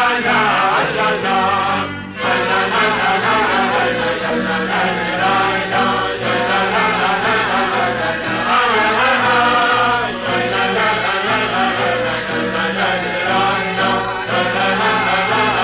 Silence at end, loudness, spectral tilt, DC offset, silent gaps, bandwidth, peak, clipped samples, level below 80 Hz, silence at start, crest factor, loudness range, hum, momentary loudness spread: 0 s; -15 LUFS; -8 dB/octave; under 0.1%; none; 4 kHz; -4 dBFS; under 0.1%; -46 dBFS; 0 s; 12 dB; 2 LU; none; 5 LU